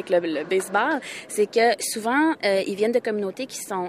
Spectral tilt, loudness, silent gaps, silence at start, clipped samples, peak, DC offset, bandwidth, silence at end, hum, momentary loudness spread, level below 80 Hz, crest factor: -3.5 dB/octave; -23 LUFS; none; 0 s; under 0.1%; -8 dBFS; under 0.1%; 15.5 kHz; 0 s; none; 9 LU; -74 dBFS; 16 dB